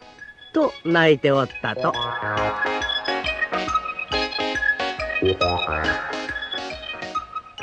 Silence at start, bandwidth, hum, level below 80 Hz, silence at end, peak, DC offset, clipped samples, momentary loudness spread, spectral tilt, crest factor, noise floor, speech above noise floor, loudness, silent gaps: 0 s; 9.2 kHz; none; -44 dBFS; 0 s; -4 dBFS; under 0.1%; under 0.1%; 10 LU; -5 dB/octave; 20 dB; -43 dBFS; 22 dB; -22 LUFS; none